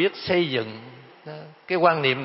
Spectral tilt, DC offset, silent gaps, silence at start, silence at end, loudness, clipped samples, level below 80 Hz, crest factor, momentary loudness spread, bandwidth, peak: -9.5 dB/octave; under 0.1%; none; 0 s; 0 s; -22 LUFS; under 0.1%; -64 dBFS; 20 dB; 22 LU; 5.8 kHz; -4 dBFS